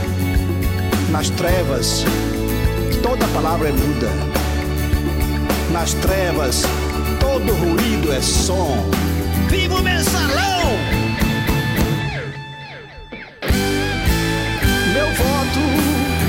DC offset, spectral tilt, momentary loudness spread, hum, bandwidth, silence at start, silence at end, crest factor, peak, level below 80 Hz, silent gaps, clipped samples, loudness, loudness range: under 0.1%; -4.5 dB/octave; 4 LU; none; 16.5 kHz; 0 s; 0 s; 12 dB; -6 dBFS; -24 dBFS; none; under 0.1%; -18 LUFS; 3 LU